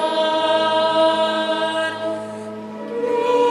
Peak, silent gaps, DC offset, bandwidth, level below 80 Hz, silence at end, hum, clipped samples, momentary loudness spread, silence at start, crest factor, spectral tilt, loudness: -6 dBFS; none; under 0.1%; 11.5 kHz; -68 dBFS; 0 s; none; under 0.1%; 14 LU; 0 s; 14 dB; -3.5 dB/octave; -19 LUFS